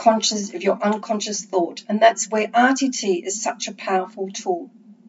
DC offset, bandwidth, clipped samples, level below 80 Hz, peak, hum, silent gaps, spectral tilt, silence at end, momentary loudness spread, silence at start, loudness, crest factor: under 0.1%; 8 kHz; under 0.1%; -90 dBFS; 0 dBFS; none; none; -3 dB/octave; 0.15 s; 9 LU; 0 s; -21 LUFS; 20 dB